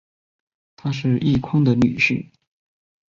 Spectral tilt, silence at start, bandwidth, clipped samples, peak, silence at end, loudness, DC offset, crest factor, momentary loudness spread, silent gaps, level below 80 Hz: -7 dB/octave; 0.85 s; 7.4 kHz; under 0.1%; -4 dBFS; 0.85 s; -19 LUFS; under 0.1%; 16 dB; 11 LU; none; -48 dBFS